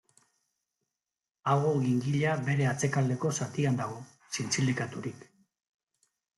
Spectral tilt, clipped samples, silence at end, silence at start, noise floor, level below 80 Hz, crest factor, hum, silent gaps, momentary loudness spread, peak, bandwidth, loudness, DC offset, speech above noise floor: -5.5 dB/octave; under 0.1%; 1.2 s; 1.45 s; under -90 dBFS; -70 dBFS; 18 dB; none; none; 11 LU; -14 dBFS; 12 kHz; -30 LUFS; under 0.1%; over 61 dB